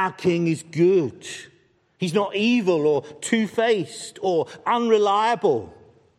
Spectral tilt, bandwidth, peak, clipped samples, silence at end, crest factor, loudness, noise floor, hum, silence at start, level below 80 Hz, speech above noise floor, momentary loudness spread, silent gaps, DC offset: -5.5 dB/octave; 12.5 kHz; -6 dBFS; under 0.1%; 0.5 s; 16 dB; -22 LUFS; -60 dBFS; none; 0 s; -68 dBFS; 39 dB; 10 LU; none; under 0.1%